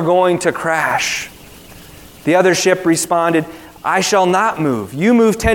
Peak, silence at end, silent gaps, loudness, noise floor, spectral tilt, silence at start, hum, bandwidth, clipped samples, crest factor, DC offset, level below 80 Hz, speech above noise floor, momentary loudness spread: 0 dBFS; 0 s; none; -15 LUFS; -38 dBFS; -4 dB/octave; 0 s; none; 18 kHz; under 0.1%; 16 dB; under 0.1%; -40 dBFS; 24 dB; 9 LU